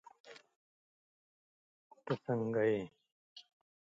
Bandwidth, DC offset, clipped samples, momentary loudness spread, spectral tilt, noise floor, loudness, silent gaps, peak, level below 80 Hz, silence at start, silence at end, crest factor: 7.6 kHz; under 0.1%; under 0.1%; 25 LU; -8 dB/octave; under -90 dBFS; -36 LUFS; 0.56-1.90 s, 3.12-3.36 s; -22 dBFS; -80 dBFS; 0.25 s; 0.45 s; 20 dB